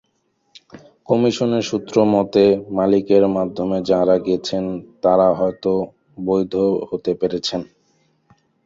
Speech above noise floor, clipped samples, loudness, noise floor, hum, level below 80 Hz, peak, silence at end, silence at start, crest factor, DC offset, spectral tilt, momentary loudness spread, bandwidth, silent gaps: 49 dB; under 0.1%; -18 LUFS; -67 dBFS; none; -54 dBFS; -2 dBFS; 1 s; 0.75 s; 18 dB; under 0.1%; -6.5 dB/octave; 8 LU; 7.8 kHz; none